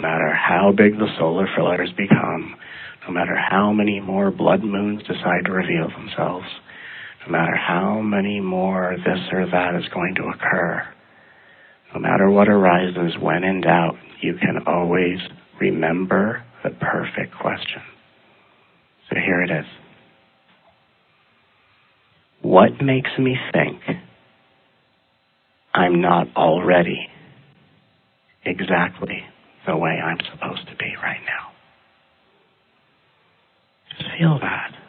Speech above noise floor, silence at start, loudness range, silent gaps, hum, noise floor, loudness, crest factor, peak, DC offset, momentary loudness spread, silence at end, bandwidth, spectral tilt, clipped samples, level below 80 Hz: 44 dB; 0 s; 8 LU; none; none; -63 dBFS; -20 LUFS; 22 dB; 0 dBFS; under 0.1%; 14 LU; 0.1 s; 4.4 kHz; -4.5 dB/octave; under 0.1%; -60 dBFS